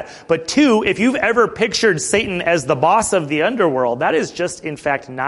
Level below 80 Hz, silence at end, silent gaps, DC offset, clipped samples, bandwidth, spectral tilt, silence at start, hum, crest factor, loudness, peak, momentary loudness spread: -48 dBFS; 0 s; none; under 0.1%; under 0.1%; 11.5 kHz; -4 dB/octave; 0 s; none; 16 dB; -17 LUFS; -2 dBFS; 7 LU